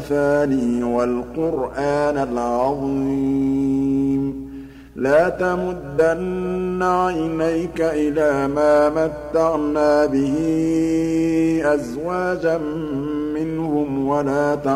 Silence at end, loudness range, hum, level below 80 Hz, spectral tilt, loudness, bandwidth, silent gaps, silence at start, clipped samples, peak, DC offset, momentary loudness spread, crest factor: 0 s; 3 LU; 60 Hz at -40 dBFS; -44 dBFS; -7 dB/octave; -20 LUFS; 14 kHz; none; 0 s; under 0.1%; -4 dBFS; under 0.1%; 7 LU; 14 dB